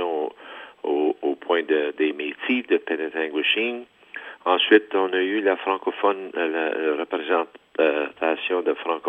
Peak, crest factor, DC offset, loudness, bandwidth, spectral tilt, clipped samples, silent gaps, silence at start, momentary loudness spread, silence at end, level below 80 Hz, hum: -2 dBFS; 22 dB; under 0.1%; -23 LUFS; 3.9 kHz; -5.5 dB/octave; under 0.1%; none; 0 s; 9 LU; 0 s; -78 dBFS; none